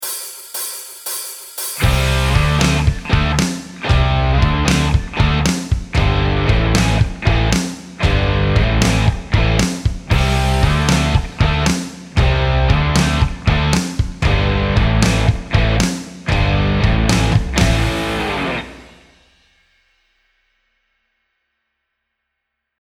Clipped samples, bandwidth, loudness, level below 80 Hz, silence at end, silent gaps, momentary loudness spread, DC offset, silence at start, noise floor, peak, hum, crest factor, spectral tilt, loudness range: under 0.1%; over 20 kHz; -17 LUFS; -22 dBFS; 4 s; none; 9 LU; under 0.1%; 0 s; -76 dBFS; 0 dBFS; none; 16 dB; -5 dB/octave; 3 LU